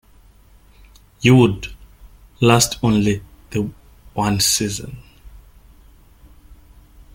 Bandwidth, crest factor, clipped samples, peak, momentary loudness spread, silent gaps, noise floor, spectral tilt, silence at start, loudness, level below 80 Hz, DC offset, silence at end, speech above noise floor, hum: 17 kHz; 20 dB; under 0.1%; 0 dBFS; 17 LU; none; -49 dBFS; -4.5 dB/octave; 1.2 s; -17 LUFS; -42 dBFS; under 0.1%; 1.75 s; 33 dB; none